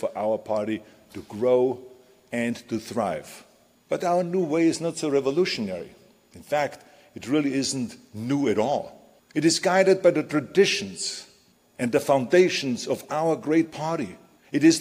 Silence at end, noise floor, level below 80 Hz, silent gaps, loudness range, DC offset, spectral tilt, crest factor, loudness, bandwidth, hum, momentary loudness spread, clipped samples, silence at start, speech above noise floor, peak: 0 s; -59 dBFS; -66 dBFS; none; 5 LU; under 0.1%; -4.5 dB/octave; 18 dB; -24 LUFS; 15.5 kHz; none; 15 LU; under 0.1%; 0 s; 35 dB; -6 dBFS